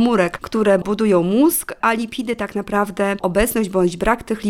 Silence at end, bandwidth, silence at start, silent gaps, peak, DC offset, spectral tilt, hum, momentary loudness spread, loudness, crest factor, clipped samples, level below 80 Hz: 0 s; 19 kHz; 0 s; none; -2 dBFS; under 0.1%; -5 dB/octave; none; 7 LU; -18 LUFS; 16 dB; under 0.1%; -40 dBFS